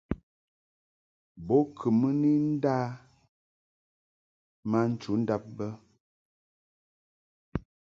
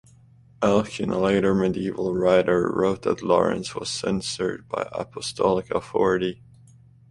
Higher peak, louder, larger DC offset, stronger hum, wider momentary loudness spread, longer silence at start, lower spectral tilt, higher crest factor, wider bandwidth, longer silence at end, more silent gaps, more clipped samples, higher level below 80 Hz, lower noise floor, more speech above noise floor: second, -12 dBFS vs -4 dBFS; second, -29 LUFS vs -24 LUFS; neither; neither; first, 14 LU vs 9 LU; second, 0.1 s vs 0.6 s; first, -9 dB/octave vs -5.5 dB/octave; about the same, 20 dB vs 20 dB; second, 7.2 kHz vs 11.5 kHz; second, 0.35 s vs 0.75 s; first, 0.23-1.35 s, 3.29-4.63 s, 6.00-7.52 s vs none; neither; about the same, -56 dBFS vs -52 dBFS; first, under -90 dBFS vs -53 dBFS; first, over 63 dB vs 30 dB